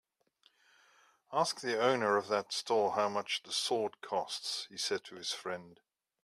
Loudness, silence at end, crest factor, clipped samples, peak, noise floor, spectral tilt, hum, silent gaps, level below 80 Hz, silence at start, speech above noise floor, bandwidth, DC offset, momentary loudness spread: -34 LUFS; 0.5 s; 20 dB; under 0.1%; -14 dBFS; -72 dBFS; -2.5 dB/octave; none; none; -84 dBFS; 1.3 s; 37 dB; 15 kHz; under 0.1%; 8 LU